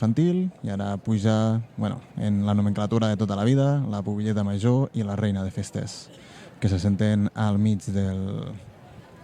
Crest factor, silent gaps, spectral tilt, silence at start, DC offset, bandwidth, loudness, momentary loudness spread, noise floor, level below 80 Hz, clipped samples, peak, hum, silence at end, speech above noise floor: 16 dB; none; -7.5 dB/octave; 0 s; under 0.1%; 10.5 kHz; -25 LUFS; 10 LU; -47 dBFS; -56 dBFS; under 0.1%; -8 dBFS; none; 0.05 s; 23 dB